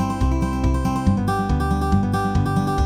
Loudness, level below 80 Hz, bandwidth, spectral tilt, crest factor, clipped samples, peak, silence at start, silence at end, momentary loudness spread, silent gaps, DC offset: -21 LUFS; -26 dBFS; 15.5 kHz; -7.5 dB/octave; 14 dB; under 0.1%; -4 dBFS; 0 s; 0 s; 1 LU; none; under 0.1%